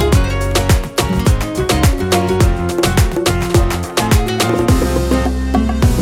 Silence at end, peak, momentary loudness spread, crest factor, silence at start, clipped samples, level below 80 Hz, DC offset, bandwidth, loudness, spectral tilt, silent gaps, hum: 0 s; -4 dBFS; 3 LU; 10 dB; 0 s; under 0.1%; -18 dBFS; under 0.1%; 17 kHz; -15 LUFS; -5.5 dB/octave; none; none